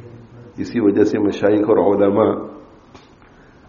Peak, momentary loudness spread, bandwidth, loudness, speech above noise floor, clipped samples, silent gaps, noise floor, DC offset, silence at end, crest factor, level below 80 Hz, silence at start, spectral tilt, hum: -2 dBFS; 15 LU; 7.2 kHz; -16 LUFS; 31 dB; under 0.1%; none; -47 dBFS; under 0.1%; 0.7 s; 18 dB; -54 dBFS; 0.05 s; -6.5 dB/octave; none